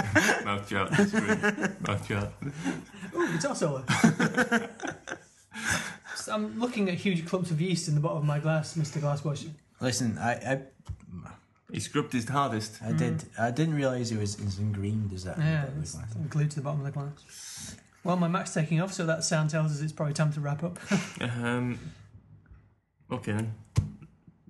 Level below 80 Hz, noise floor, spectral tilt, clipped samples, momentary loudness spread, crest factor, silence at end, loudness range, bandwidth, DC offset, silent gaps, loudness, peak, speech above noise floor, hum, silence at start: -56 dBFS; -63 dBFS; -5.5 dB/octave; under 0.1%; 14 LU; 24 dB; 0.2 s; 4 LU; 12.5 kHz; under 0.1%; none; -30 LUFS; -6 dBFS; 34 dB; none; 0 s